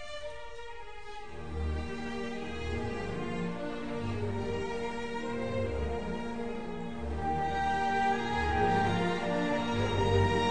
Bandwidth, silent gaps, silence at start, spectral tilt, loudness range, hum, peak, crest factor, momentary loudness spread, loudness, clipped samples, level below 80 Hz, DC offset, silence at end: 9.8 kHz; none; 0 s; -6 dB/octave; 8 LU; none; -16 dBFS; 16 dB; 14 LU; -33 LUFS; under 0.1%; -44 dBFS; 0.7%; 0 s